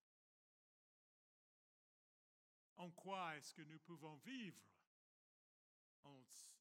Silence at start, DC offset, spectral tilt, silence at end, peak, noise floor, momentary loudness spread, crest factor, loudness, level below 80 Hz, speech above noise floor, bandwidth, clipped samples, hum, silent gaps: 2.75 s; under 0.1%; -4 dB/octave; 0 s; -36 dBFS; under -90 dBFS; 16 LU; 24 dB; -55 LUFS; under -90 dBFS; over 34 dB; 16 kHz; under 0.1%; none; 4.87-6.03 s